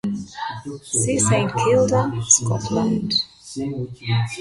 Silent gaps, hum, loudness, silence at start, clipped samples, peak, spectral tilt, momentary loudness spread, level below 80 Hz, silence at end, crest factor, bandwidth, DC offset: none; none; -20 LUFS; 0.05 s; under 0.1%; -2 dBFS; -4 dB/octave; 14 LU; -50 dBFS; 0 s; 18 dB; 11.5 kHz; under 0.1%